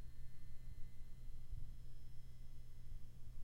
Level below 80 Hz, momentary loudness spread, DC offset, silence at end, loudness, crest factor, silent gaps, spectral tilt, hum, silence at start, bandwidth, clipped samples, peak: -50 dBFS; 5 LU; under 0.1%; 0 s; -60 LUFS; 10 dB; none; -6 dB/octave; none; 0 s; 5.4 kHz; under 0.1%; -34 dBFS